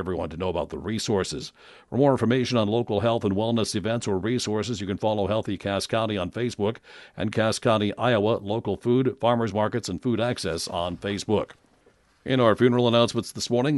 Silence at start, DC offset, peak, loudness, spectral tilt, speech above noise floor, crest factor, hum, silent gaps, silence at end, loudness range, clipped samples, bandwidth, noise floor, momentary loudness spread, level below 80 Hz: 0 s; under 0.1%; -6 dBFS; -25 LUFS; -5.5 dB/octave; 36 dB; 20 dB; none; none; 0 s; 3 LU; under 0.1%; 11.5 kHz; -61 dBFS; 8 LU; -54 dBFS